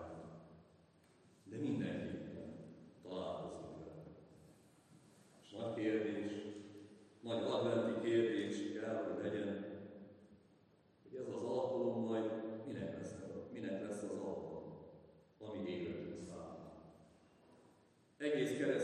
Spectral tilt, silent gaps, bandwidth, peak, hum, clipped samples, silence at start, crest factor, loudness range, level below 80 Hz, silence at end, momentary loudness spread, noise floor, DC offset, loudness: -6.5 dB/octave; none; 12 kHz; -24 dBFS; none; under 0.1%; 0 s; 20 dB; 10 LU; -80 dBFS; 0 s; 21 LU; -70 dBFS; under 0.1%; -42 LUFS